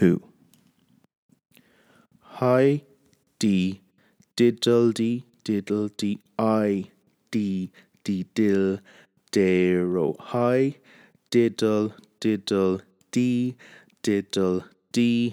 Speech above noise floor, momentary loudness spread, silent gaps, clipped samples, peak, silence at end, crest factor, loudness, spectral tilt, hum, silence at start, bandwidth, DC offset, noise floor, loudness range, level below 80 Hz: 40 dB; 10 LU; 1.17-1.29 s; under 0.1%; -6 dBFS; 0 s; 18 dB; -24 LUFS; -6.5 dB/octave; none; 0 s; 16 kHz; under 0.1%; -63 dBFS; 3 LU; -70 dBFS